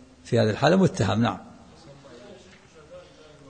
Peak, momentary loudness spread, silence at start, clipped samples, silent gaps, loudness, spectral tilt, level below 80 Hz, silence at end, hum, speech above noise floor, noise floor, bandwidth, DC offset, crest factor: -6 dBFS; 14 LU; 0.25 s; under 0.1%; none; -23 LUFS; -6.5 dB/octave; -56 dBFS; 0.5 s; none; 29 dB; -51 dBFS; 9.6 kHz; under 0.1%; 20 dB